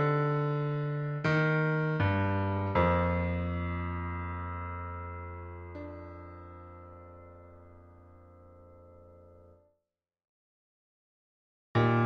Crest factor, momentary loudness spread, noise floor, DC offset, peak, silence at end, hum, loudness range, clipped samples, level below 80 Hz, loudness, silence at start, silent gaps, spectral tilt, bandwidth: 20 dB; 22 LU; -86 dBFS; under 0.1%; -14 dBFS; 0 s; none; 22 LU; under 0.1%; -52 dBFS; -31 LUFS; 0 s; 10.29-11.75 s; -9 dB/octave; 6.6 kHz